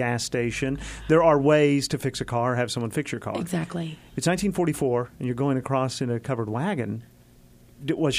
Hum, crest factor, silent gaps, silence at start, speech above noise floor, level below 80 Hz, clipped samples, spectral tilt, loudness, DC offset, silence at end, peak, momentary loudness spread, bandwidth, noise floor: none; 18 dB; none; 0 s; 28 dB; -50 dBFS; under 0.1%; -5.5 dB/octave; -25 LUFS; under 0.1%; 0 s; -6 dBFS; 12 LU; 15.5 kHz; -53 dBFS